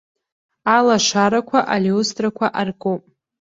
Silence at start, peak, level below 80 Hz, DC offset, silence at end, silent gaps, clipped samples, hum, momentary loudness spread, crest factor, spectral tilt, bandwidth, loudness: 0.65 s; -2 dBFS; -60 dBFS; under 0.1%; 0.4 s; none; under 0.1%; none; 10 LU; 18 dB; -4 dB/octave; 7.8 kHz; -18 LUFS